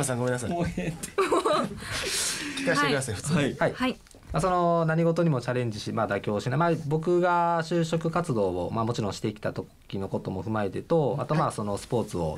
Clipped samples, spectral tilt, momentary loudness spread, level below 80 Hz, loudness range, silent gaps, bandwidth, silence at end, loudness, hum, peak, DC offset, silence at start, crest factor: under 0.1%; -5 dB/octave; 8 LU; -52 dBFS; 4 LU; none; 15 kHz; 0 s; -27 LUFS; none; -12 dBFS; under 0.1%; 0 s; 16 dB